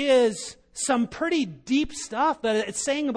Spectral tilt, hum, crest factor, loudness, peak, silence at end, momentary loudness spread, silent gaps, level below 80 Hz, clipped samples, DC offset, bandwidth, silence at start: -3 dB/octave; none; 14 dB; -25 LUFS; -10 dBFS; 0 s; 8 LU; none; -52 dBFS; under 0.1%; under 0.1%; 10.5 kHz; 0 s